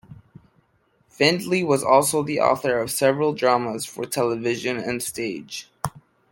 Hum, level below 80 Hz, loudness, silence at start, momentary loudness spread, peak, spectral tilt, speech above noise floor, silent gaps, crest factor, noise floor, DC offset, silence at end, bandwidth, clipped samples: none; -60 dBFS; -22 LUFS; 0.1 s; 13 LU; -2 dBFS; -4 dB/octave; 43 dB; none; 22 dB; -64 dBFS; under 0.1%; 0.35 s; 17 kHz; under 0.1%